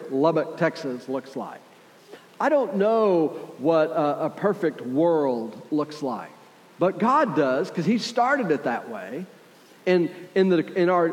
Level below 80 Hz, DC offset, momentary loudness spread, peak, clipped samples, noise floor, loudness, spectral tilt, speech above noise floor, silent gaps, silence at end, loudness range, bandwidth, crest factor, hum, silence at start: -88 dBFS; under 0.1%; 12 LU; -6 dBFS; under 0.1%; -51 dBFS; -24 LUFS; -6.5 dB/octave; 28 dB; none; 0 s; 2 LU; 15.5 kHz; 16 dB; none; 0 s